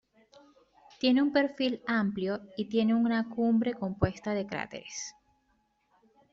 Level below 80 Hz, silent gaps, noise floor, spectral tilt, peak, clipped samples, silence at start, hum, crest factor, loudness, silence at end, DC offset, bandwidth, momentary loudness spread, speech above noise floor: -58 dBFS; none; -73 dBFS; -5.5 dB/octave; -12 dBFS; under 0.1%; 1.05 s; none; 20 dB; -30 LUFS; 1.2 s; under 0.1%; 7.6 kHz; 12 LU; 44 dB